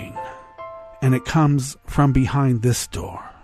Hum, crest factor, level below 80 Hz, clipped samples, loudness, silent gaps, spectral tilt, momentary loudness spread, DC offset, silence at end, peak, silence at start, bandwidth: none; 18 dB; -38 dBFS; under 0.1%; -20 LUFS; none; -6 dB/octave; 19 LU; under 0.1%; 0.1 s; -4 dBFS; 0 s; 14 kHz